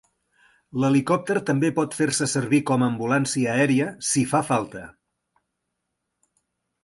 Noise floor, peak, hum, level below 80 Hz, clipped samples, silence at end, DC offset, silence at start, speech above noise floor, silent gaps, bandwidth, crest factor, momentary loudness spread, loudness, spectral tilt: -79 dBFS; -6 dBFS; none; -62 dBFS; under 0.1%; 1.95 s; under 0.1%; 0.75 s; 57 dB; none; 11.5 kHz; 18 dB; 5 LU; -22 LUFS; -5 dB/octave